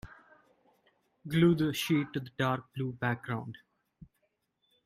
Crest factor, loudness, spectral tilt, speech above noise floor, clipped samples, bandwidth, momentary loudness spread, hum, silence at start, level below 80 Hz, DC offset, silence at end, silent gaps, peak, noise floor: 20 dB; -31 LUFS; -6.5 dB/octave; 48 dB; under 0.1%; 15.5 kHz; 22 LU; none; 0.05 s; -64 dBFS; under 0.1%; 1.3 s; none; -12 dBFS; -78 dBFS